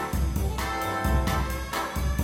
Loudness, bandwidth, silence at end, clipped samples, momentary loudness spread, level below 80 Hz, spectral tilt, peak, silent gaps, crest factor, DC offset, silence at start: -28 LUFS; 17 kHz; 0 s; under 0.1%; 4 LU; -30 dBFS; -5 dB/octave; -12 dBFS; none; 14 dB; under 0.1%; 0 s